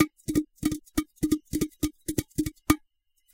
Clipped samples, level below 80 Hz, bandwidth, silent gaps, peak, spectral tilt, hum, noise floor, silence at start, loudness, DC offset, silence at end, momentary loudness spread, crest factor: under 0.1%; -44 dBFS; 17 kHz; none; -4 dBFS; -5 dB/octave; none; -68 dBFS; 0 s; -30 LUFS; under 0.1%; 0.55 s; 6 LU; 26 dB